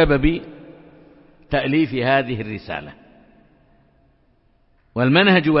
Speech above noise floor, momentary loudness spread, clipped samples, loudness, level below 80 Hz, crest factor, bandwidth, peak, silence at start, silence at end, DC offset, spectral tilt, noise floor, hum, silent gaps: 41 dB; 17 LU; under 0.1%; -19 LUFS; -38 dBFS; 20 dB; 5.8 kHz; 0 dBFS; 0 s; 0 s; under 0.1%; -11 dB/octave; -59 dBFS; none; none